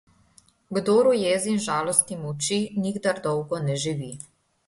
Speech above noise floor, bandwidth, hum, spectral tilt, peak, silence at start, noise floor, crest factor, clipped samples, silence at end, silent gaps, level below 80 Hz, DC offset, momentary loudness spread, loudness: 35 dB; 11.5 kHz; none; -4 dB/octave; -4 dBFS; 0.7 s; -59 dBFS; 22 dB; under 0.1%; 0.5 s; none; -62 dBFS; under 0.1%; 12 LU; -24 LUFS